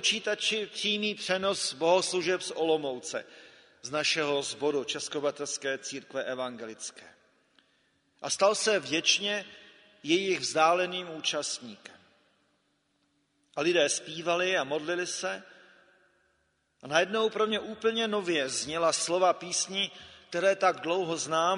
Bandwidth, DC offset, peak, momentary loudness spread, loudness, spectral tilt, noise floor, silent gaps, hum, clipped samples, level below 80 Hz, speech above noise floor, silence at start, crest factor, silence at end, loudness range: 10.5 kHz; under 0.1%; -8 dBFS; 12 LU; -29 LUFS; -2 dB/octave; -74 dBFS; none; none; under 0.1%; -76 dBFS; 44 dB; 0 s; 22 dB; 0 s; 5 LU